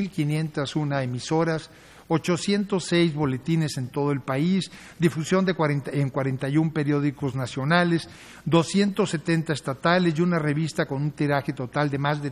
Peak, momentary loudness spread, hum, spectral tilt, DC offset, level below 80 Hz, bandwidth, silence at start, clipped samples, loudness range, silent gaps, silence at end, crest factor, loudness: -4 dBFS; 6 LU; none; -6 dB/octave; under 0.1%; -58 dBFS; 13 kHz; 0 s; under 0.1%; 2 LU; none; 0 s; 20 dB; -25 LUFS